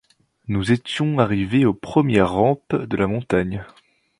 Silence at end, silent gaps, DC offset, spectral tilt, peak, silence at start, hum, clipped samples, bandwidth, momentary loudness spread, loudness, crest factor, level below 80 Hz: 0.55 s; none; under 0.1%; -7.5 dB/octave; 0 dBFS; 0.5 s; none; under 0.1%; 11 kHz; 8 LU; -20 LUFS; 20 dB; -46 dBFS